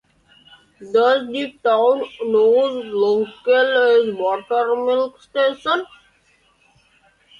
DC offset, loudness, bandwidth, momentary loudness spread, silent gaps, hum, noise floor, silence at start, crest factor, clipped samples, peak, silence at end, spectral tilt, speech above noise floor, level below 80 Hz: under 0.1%; -18 LUFS; 7.2 kHz; 8 LU; none; none; -59 dBFS; 0.8 s; 14 dB; under 0.1%; -4 dBFS; 1.55 s; -5 dB/octave; 41 dB; -66 dBFS